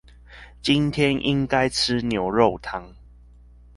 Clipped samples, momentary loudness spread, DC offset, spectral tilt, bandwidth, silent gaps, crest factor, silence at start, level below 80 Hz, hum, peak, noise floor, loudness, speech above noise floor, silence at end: under 0.1%; 11 LU; under 0.1%; -5 dB/octave; 11.5 kHz; none; 22 dB; 0.3 s; -46 dBFS; 60 Hz at -45 dBFS; -2 dBFS; -49 dBFS; -22 LUFS; 27 dB; 0.85 s